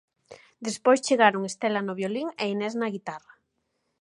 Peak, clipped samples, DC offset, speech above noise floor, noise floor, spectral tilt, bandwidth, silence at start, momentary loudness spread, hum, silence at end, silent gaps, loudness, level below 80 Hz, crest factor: -4 dBFS; under 0.1%; under 0.1%; 51 dB; -76 dBFS; -4 dB/octave; 11.5 kHz; 0.3 s; 16 LU; none; 0.85 s; none; -26 LUFS; -78 dBFS; 24 dB